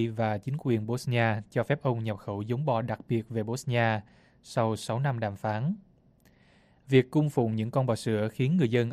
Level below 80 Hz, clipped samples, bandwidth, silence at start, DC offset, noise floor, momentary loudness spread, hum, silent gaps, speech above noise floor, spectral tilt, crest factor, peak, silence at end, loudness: -64 dBFS; under 0.1%; 13.5 kHz; 0 s; under 0.1%; -62 dBFS; 7 LU; none; none; 34 dB; -7 dB/octave; 20 dB; -10 dBFS; 0 s; -29 LUFS